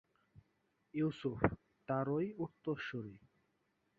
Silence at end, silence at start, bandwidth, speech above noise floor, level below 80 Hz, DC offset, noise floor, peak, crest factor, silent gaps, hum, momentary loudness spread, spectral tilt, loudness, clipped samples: 0.8 s; 0.35 s; 6.6 kHz; 42 dB; -62 dBFS; under 0.1%; -81 dBFS; -12 dBFS; 28 dB; none; none; 10 LU; -6.5 dB/octave; -40 LUFS; under 0.1%